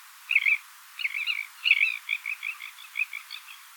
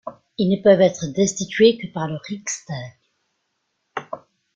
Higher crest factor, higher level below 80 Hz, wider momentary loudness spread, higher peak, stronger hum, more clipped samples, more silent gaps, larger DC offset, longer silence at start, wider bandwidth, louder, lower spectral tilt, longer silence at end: about the same, 22 dB vs 20 dB; second, under -90 dBFS vs -60 dBFS; second, 17 LU vs 20 LU; second, -8 dBFS vs -2 dBFS; neither; neither; neither; neither; about the same, 0 s vs 0.05 s; first, 19 kHz vs 9.2 kHz; second, -26 LUFS vs -19 LUFS; second, 10.5 dB/octave vs -5 dB/octave; second, 0 s vs 0.35 s